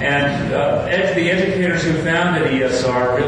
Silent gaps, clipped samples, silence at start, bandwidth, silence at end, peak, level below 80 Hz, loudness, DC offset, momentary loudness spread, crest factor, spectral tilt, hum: none; under 0.1%; 0 s; 10 kHz; 0 s; -6 dBFS; -42 dBFS; -17 LUFS; under 0.1%; 2 LU; 12 dB; -5.5 dB/octave; none